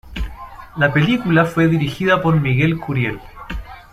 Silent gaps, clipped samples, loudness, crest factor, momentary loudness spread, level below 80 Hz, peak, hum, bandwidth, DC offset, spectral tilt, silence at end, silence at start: none; under 0.1%; -17 LUFS; 16 dB; 17 LU; -34 dBFS; -2 dBFS; none; 13.5 kHz; under 0.1%; -7.5 dB/octave; 0.1 s; 0.05 s